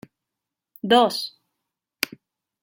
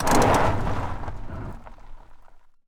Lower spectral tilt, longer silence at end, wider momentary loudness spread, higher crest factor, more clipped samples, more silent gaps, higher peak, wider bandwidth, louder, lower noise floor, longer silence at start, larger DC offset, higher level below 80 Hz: second, -3.5 dB/octave vs -5 dB/octave; first, 1.35 s vs 0.3 s; second, 16 LU vs 19 LU; first, 24 dB vs 18 dB; neither; neither; first, -2 dBFS vs -6 dBFS; about the same, 16.5 kHz vs 16 kHz; about the same, -22 LUFS vs -24 LUFS; first, -86 dBFS vs -47 dBFS; first, 0.85 s vs 0 s; neither; second, -74 dBFS vs -32 dBFS